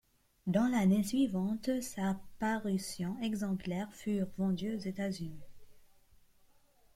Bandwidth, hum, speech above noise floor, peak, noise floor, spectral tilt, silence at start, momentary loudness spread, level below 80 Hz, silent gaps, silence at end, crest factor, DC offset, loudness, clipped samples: 15.5 kHz; none; 32 dB; -18 dBFS; -66 dBFS; -6 dB/octave; 0.45 s; 9 LU; -62 dBFS; none; 1.1 s; 18 dB; under 0.1%; -35 LUFS; under 0.1%